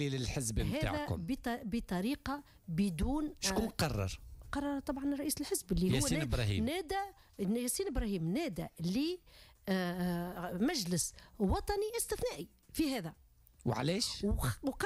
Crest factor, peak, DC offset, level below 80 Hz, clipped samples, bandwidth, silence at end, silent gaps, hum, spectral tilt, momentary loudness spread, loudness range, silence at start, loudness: 14 dB; -22 dBFS; under 0.1%; -46 dBFS; under 0.1%; 16 kHz; 0 s; none; none; -5 dB/octave; 7 LU; 2 LU; 0 s; -36 LUFS